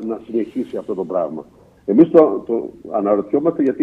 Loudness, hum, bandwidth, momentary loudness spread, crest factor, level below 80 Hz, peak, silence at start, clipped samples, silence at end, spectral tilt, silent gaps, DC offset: -18 LUFS; none; 4 kHz; 14 LU; 18 dB; -58 dBFS; 0 dBFS; 0 s; under 0.1%; 0 s; -10 dB/octave; none; under 0.1%